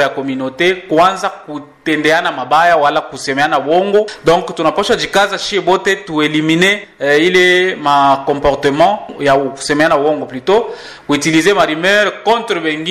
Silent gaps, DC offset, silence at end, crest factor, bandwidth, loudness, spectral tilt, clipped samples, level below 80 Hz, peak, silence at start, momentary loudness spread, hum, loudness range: none; 0.2%; 0 s; 12 dB; 14 kHz; -13 LUFS; -4 dB/octave; under 0.1%; -44 dBFS; -2 dBFS; 0 s; 8 LU; none; 2 LU